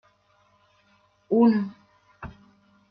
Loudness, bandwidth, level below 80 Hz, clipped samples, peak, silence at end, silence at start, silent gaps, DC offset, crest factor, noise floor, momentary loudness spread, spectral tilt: -23 LUFS; 5.2 kHz; -60 dBFS; under 0.1%; -8 dBFS; 0.65 s; 1.3 s; none; under 0.1%; 20 dB; -64 dBFS; 24 LU; -10 dB/octave